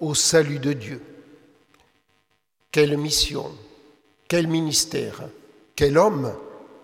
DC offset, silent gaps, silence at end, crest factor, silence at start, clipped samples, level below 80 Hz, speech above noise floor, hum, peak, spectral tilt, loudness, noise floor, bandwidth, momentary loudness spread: under 0.1%; none; 0.2 s; 20 dB; 0 s; under 0.1%; -46 dBFS; 48 dB; none; -4 dBFS; -3.5 dB/octave; -21 LUFS; -70 dBFS; 16 kHz; 21 LU